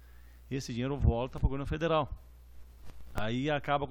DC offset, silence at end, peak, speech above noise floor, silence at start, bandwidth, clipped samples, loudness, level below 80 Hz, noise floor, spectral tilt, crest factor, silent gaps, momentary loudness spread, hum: under 0.1%; 0 s; -14 dBFS; 22 dB; 0 s; 16.5 kHz; under 0.1%; -33 LUFS; -40 dBFS; -53 dBFS; -6.5 dB/octave; 20 dB; none; 10 LU; none